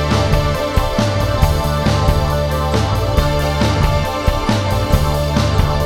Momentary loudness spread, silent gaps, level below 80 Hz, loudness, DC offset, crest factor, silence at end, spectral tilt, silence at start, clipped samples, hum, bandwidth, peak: 2 LU; none; -20 dBFS; -16 LUFS; under 0.1%; 14 dB; 0 s; -6 dB/octave; 0 s; under 0.1%; none; 17.5 kHz; 0 dBFS